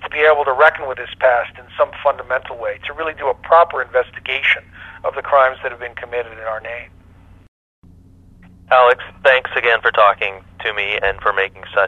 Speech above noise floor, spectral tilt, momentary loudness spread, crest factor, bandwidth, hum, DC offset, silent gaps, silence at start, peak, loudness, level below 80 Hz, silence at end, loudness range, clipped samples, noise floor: 28 dB; -4.5 dB/octave; 13 LU; 18 dB; 7 kHz; none; under 0.1%; 7.48-7.82 s; 0 s; 0 dBFS; -17 LUFS; -48 dBFS; 0 s; 6 LU; under 0.1%; -45 dBFS